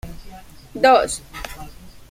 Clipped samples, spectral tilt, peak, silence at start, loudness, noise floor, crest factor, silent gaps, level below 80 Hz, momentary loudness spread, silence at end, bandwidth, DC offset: under 0.1%; -3 dB/octave; -2 dBFS; 0.05 s; -17 LUFS; -40 dBFS; 20 dB; none; -42 dBFS; 24 LU; 0.1 s; 16.5 kHz; under 0.1%